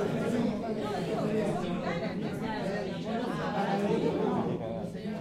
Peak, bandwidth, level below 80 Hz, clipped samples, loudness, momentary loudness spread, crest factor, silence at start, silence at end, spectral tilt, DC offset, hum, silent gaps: -16 dBFS; 14.5 kHz; -58 dBFS; under 0.1%; -32 LUFS; 5 LU; 16 dB; 0 s; 0 s; -7 dB/octave; under 0.1%; none; none